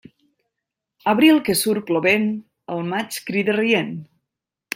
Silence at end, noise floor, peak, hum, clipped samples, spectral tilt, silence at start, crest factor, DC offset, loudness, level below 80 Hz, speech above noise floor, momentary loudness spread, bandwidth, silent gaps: 0.7 s; -83 dBFS; -2 dBFS; none; under 0.1%; -4.5 dB/octave; 1.05 s; 20 dB; under 0.1%; -19 LUFS; -64 dBFS; 64 dB; 15 LU; 16.5 kHz; none